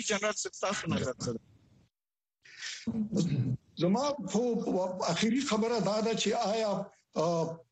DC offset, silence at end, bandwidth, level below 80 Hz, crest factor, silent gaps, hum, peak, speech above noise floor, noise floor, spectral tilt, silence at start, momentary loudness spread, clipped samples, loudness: under 0.1%; 0.1 s; 8.4 kHz; -64 dBFS; 16 dB; none; none; -16 dBFS; over 59 dB; under -90 dBFS; -5 dB/octave; 0 s; 8 LU; under 0.1%; -32 LUFS